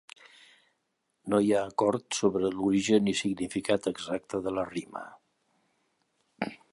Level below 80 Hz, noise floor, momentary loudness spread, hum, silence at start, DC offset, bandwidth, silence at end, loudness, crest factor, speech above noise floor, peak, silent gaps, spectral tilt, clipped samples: -64 dBFS; -79 dBFS; 13 LU; none; 1.25 s; under 0.1%; 11.5 kHz; 0.15 s; -29 LUFS; 20 dB; 51 dB; -10 dBFS; none; -5 dB/octave; under 0.1%